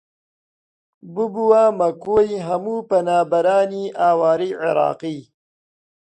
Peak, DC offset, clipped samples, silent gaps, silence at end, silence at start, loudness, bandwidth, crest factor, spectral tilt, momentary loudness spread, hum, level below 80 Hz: -2 dBFS; under 0.1%; under 0.1%; none; 0.9 s; 1.05 s; -18 LUFS; 9 kHz; 16 dB; -6.5 dB/octave; 10 LU; none; -58 dBFS